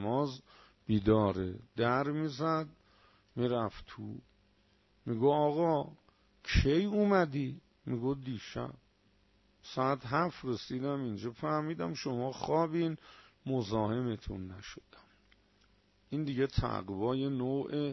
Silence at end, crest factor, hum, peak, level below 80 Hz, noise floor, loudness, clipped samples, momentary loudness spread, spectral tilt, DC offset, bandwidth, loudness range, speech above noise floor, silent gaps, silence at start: 0 s; 20 dB; none; -14 dBFS; -50 dBFS; -69 dBFS; -34 LUFS; under 0.1%; 17 LU; -7 dB/octave; under 0.1%; 6.2 kHz; 6 LU; 36 dB; none; 0 s